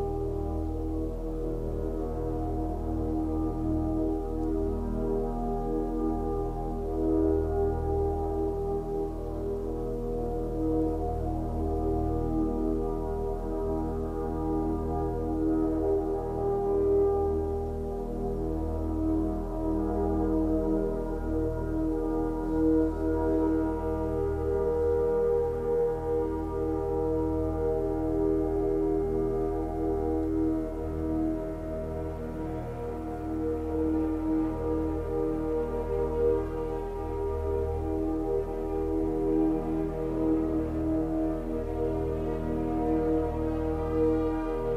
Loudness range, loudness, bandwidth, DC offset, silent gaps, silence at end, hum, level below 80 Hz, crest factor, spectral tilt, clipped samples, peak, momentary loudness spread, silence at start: 3 LU; -30 LUFS; 12 kHz; under 0.1%; none; 0 s; none; -38 dBFS; 14 dB; -10 dB/octave; under 0.1%; -16 dBFS; 6 LU; 0 s